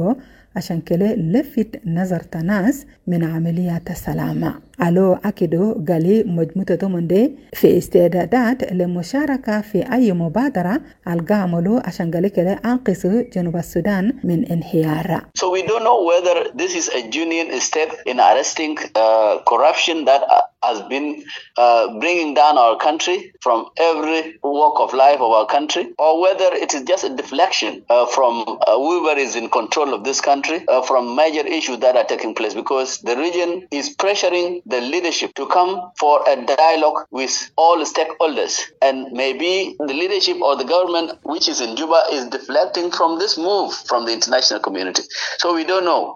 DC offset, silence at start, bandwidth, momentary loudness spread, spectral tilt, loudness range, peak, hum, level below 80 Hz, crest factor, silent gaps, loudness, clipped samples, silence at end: under 0.1%; 0 s; 17 kHz; 8 LU; -4.5 dB/octave; 4 LU; 0 dBFS; none; -52 dBFS; 18 dB; none; -18 LUFS; under 0.1%; 0 s